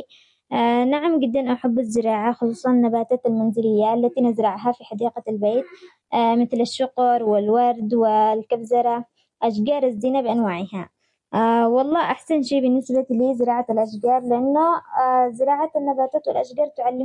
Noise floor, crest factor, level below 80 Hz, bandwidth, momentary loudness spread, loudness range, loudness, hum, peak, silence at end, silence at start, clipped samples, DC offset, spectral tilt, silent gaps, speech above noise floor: -52 dBFS; 10 dB; -70 dBFS; 10.5 kHz; 7 LU; 2 LU; -20 LUFS; none; -10 dBFS; 0 s; 0 s; under 0.1%; under 0.1%; -6.5 dB/octave; none; 32 dB